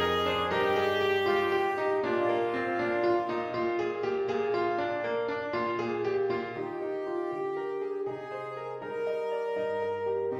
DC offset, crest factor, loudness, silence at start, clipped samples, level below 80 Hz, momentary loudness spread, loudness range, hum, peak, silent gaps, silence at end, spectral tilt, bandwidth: under 0.1%; 14 dB; -30 LUFS; 0 s; under 0.1%; -64 dBFS; 8 LU; 6 LU; none; -16 dBFS; none; 0 s; -6 dB/octave; 15.5 kHz